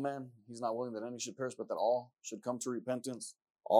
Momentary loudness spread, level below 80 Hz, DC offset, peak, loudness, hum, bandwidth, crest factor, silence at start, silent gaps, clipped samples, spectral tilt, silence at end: 13 LU; under -90 dBFS; under 0.1%; -12 dBFS; -39 LUFS; none; 15.5 kHz; 24 dB; 0 s; 3.50-3.55 s; under 0.1%; -4.5 dB/octave; 0 s